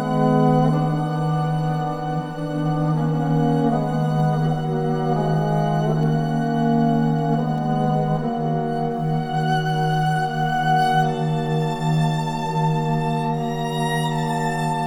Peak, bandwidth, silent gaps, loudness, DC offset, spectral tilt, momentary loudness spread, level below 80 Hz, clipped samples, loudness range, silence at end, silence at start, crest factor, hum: -6 dBFS; 11.5 kHz; none; -21 LUFS; under 0.1%; -7.5 dB/octave; 5 LU; -48 dBFS; under 0.1%; 1 LU; 0 s; 0 s; 14 dB; none